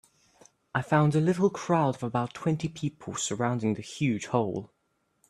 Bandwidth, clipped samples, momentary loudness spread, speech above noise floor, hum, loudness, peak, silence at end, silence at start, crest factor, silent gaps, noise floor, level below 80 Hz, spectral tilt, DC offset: 12 kHz; under 0.1%; 9 LU; 47 dB; none; -28 LUFS; -8 dBFS; 0.65 s; 0.75 s; 20 dB; none; -74 dBFS; -64 dBFS; -6 dB/octave; under 0.1%